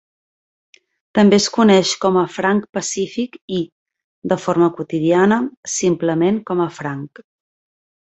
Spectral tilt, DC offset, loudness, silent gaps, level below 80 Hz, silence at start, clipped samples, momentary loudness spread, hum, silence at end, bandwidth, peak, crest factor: -5 dB/octave; under 0.1%; -17 LUFS; 3.41-3.48 s, 3.72-3.86 s, 4.04-4.22 s, 5.57-5.63 s; -58 dBFS; 1.15 s; under 0.1%; 13 LU; none; 1 s; 8.2 kHz; -2 dBFS; 16 dB